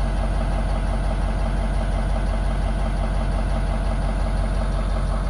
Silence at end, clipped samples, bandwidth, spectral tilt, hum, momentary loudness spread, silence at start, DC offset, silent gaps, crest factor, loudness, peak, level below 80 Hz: 0 s; under 0.1%; 11 kHz; -7 dB/octave; none; 0 LU; 0 s; under 0.1%; none; 10 dB; -25 LUFS; -12 dBFS; -22 dBFS